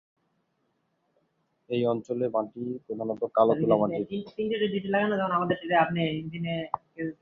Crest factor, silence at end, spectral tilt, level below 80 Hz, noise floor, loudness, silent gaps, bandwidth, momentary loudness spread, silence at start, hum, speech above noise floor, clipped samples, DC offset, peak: 20 dB; 0.1 s; -8.5 dB/octave; -66 dBFS; -75 dBFS; -28 LUFS; none; 7.2 kHz; 10 LU; 1.7 s; none; 47 dB; under 0.1%; under 0.1%; -8 dBFS